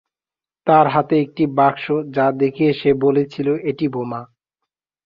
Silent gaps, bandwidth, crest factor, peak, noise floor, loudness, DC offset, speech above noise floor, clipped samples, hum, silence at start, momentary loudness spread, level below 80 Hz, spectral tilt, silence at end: none; 5.6 kHz; 18 dB; 0 dBFS; under -90 dBFS; -18 LUFS; under 0.1%; over 73 dB; under 0.1%; none; 0.65 s; 9 LU; -58 dBFS; -9 dB/octave; 0.8 s